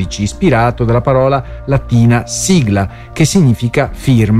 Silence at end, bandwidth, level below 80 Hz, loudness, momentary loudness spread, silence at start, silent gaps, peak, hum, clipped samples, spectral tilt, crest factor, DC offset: 0 s; 14.5 kHz; -30 dBFS; -12 LUFS; 6 LU; 0 s; none; 0 dBFS; none; under 0.1%; -6 dB/octave; 12 dB; under 0.1%